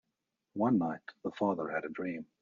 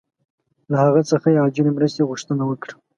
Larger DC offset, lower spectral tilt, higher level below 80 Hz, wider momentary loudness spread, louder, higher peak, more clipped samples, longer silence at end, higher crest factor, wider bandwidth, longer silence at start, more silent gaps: neither; about the same, -6.5 dB/octave vs -7.5 dB/octave; second, -76 dBFS vs -66 dBFS; first, 11 LU vs 8 LU; second, -34 LUFS vs -19 LUFS; second, -18 dBFS vs -2 dBFS; neither; about the same, 0.2 s vs 0.25 s; about the same, 18 dB vs 16 dB; second, 7 kHz vs 11 kHz; second, 0.55 s vs 0.7 s; neither